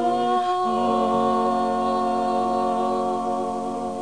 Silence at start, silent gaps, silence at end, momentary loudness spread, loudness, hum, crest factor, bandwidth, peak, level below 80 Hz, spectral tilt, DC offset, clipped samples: 0 s; none; 0 s; 5 LU; -23 LUFS; none; 12 dB; 10.5 kHz; -10 dBFS; -60 dBFS; -5.5 dB/octave; 0.4%; under 0.1%